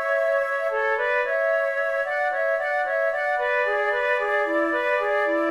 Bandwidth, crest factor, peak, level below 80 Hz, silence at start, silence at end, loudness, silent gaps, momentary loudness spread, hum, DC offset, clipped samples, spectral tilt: 12.5 kHz; 12 dB; -12 dBFS; -62 dBFS; 0 s; 0 s; -23 LUFS; none; 2 LU; none; under 0.1%; under 0.1%; -3 dB/octave